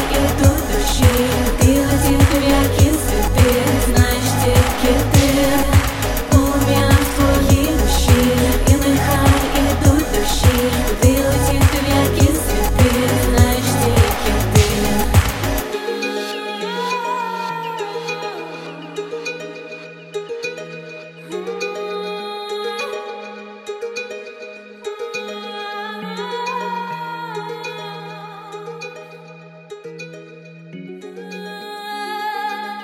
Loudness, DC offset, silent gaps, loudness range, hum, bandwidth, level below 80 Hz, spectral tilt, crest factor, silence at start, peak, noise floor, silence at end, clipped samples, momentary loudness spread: -17 LUFS; under 0.1%; none; 14 LU; none; 16.5 kHz; -24 dBFS; -5 dB/octave; 16 dB; 0 s; 0 dBFS; -39 dBFS; 0 s; under 0.1%; 18 LU